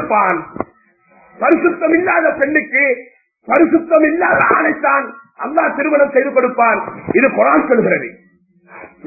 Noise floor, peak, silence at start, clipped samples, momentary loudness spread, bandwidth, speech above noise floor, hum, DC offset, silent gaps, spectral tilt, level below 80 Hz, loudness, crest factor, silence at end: -52 dBFS; 0 dBFS; 0 s; under 0.1%; 9 LU; 2.7 kHz; 38 dB; none; under 0.1%; none; -11 dB/octave; -54 dBFS; -14 LUFS; 14 dB; 0.2 s